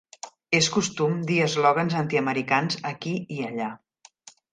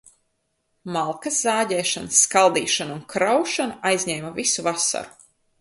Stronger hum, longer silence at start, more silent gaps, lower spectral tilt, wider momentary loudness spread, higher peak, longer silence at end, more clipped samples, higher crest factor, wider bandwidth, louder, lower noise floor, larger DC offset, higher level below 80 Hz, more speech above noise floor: neither; second, 0.25 s vs 0.85 s; neither; first, -4.5 dB/octave vs -2 dB/octave; about the same, 11 LU vs 11 LU; about the same, -6 dBFS vs -4 dBFS; first, 0.75 s vs 0.5 s; neither; about the same, 20 dB vs 20 dB; second, 9.6 kHz vs 11.5 kHz; second, -24 LUFS vs -21 LUFS; second, -52 dBFS vs -72 dBFS; neither; about the same, -66 dBFS vs -64 dBFS; second, 28 dB vs 50 dB